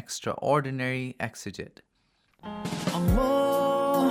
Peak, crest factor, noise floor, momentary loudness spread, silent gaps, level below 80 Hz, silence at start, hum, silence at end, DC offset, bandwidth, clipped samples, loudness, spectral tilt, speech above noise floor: -10 dBFS; 18 dB; -70 dBFS; 17 LU; none; -40 dBFS; 0 s; none; 0 s; under 0.1%; 17 kHz; under 0.1%; -27 LUFS; -5.5 dB/octave; 40 dB